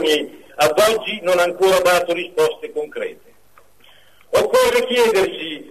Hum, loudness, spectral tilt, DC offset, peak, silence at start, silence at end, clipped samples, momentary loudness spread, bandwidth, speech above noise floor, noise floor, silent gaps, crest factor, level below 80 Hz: none; -17 LUFS; -2.5 dB/octave; 0.3%; -4 dBFS; 0 s; 0 s; under 0.1%; 12 LU; 13.5 kHz; 37 dB; -54 dBFS; none; 14 dB; -54 dBFS